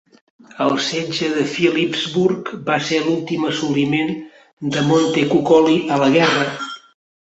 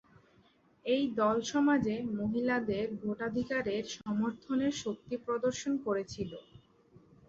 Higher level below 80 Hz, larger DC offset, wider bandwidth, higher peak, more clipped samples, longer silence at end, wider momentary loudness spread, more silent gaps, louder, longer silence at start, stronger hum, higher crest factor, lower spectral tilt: about the same, -60 dBFS vs -64 dBFS; neither; about the same, 8.2 kHz vs 8 kHz; first, -2 dBFS vs -16 dBFS; neither; second, 0.45 s vs 0.85 s; about the same, 10 LU vs 9 LU; first, 4.53-4.57 s vs none; first, -17 LUFS vs -33 LUFS; second, 0.55 s vs 0.85 s; neither; about the same, 16 dB vs 16 dB; about the same, -5 dB/octave vs -5 dB/octave